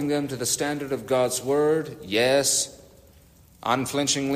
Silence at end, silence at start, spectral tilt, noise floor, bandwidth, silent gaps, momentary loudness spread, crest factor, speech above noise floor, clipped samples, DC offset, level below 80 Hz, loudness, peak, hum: 0 s; 0 s; -3 dB/octave; -54 dBFS; 15.5 kHz; none; 7 LU; 16 dB; 30 dB; under 0.1%; under 0.1%; -60 dBFS; -24 LUFS; -8 dBFS; none